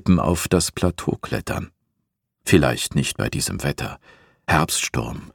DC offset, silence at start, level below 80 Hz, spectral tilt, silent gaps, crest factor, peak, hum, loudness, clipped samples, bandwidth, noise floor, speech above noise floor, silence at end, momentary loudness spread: under 0.1%; 0.05 s; -40 dBFS; -4.5 dB/octave; none; 22 dB; 0 dBFS; none; -22 LUFS; under 0.1%; 19 kHz; -76 dBFS; 55 dB; 0.05 s; 13 LU